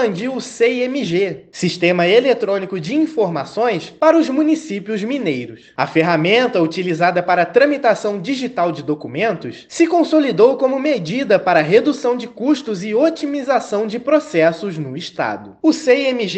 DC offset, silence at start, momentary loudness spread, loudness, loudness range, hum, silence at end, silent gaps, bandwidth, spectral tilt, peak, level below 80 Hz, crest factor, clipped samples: under 0.1%; 0 s; 9 LU; -17 LUFS; 2 LU; none; 0 s; none; 8.8 kHz; -5.5 dB/octave; 0 dBFS; -64 dBFS; 16 dB; under 0.1%